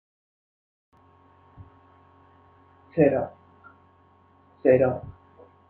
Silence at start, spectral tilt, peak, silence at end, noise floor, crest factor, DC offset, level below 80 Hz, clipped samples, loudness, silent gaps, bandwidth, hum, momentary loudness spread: 2.95 s; -11.5 dB/octave; -6 dBFS; 0.6 s; -58 dBFS; 22 dB; under 0.1%; -62 dBFS; under 0.1%; -23 LUFS; none; 3.9 kHz; none; 16 LU